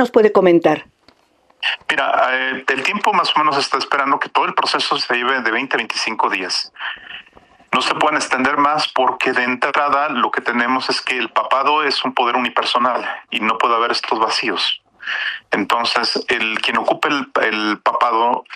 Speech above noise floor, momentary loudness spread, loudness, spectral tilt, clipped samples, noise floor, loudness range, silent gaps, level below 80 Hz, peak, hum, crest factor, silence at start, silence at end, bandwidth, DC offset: 39 dB; 6 LU; -17 LUFS; -3 dB/octave; under 0.1%; -56 dBFS; 2 LU; none; -64 dBFS; 0 dBFS; none; 18 dB; 0 s; 0 s; 14.5 kHz; under 0.1%